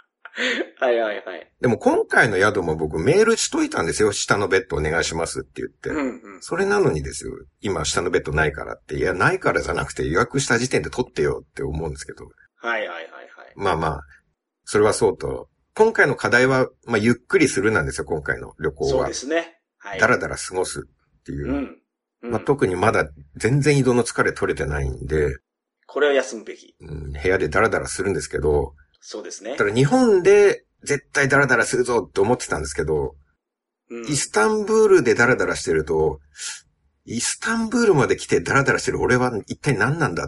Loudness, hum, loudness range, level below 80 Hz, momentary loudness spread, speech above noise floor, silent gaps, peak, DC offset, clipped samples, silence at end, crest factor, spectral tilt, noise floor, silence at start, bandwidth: -20 LUFS; none; 5 LU; -40 dBFS; 15 LU; 63 dB; none; -2 dBFS; under 0.1%; under 0.1%; 0 s; 18 dB; -4.5 dB/octave; -83 dBFS; 0.35 s; 11.5 kHz